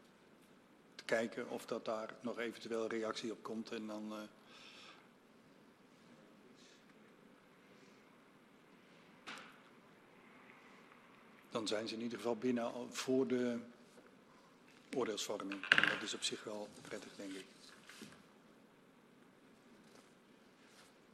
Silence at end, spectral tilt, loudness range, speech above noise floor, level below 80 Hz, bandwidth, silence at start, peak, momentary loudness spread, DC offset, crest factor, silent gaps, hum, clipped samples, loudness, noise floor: 0.2 s; -3 dB/octave; 23 LU; 25 dB; -88 dBFS; 14 kHz; 0 s; -8 dBFS; 25 LU; under 0.1%; 36 dB; none; none; under 0.1%; -40 LUFS; -66 dBFS